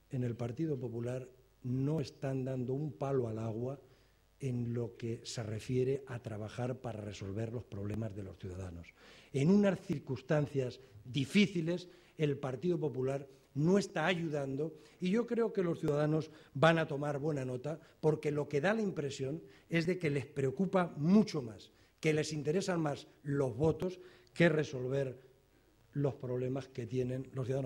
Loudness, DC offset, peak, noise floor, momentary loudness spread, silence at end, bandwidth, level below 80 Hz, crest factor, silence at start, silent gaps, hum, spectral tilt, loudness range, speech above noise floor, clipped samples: -36 LUFS; under 0.1%; -12 dBFS; -67 dBFS; 13 LU; 0 s; 16 kHz; -66 dBFS; 22 dB; 0.1 s; none; none; -7 dB/octave; 6 LU; 33 dB; under 0.1%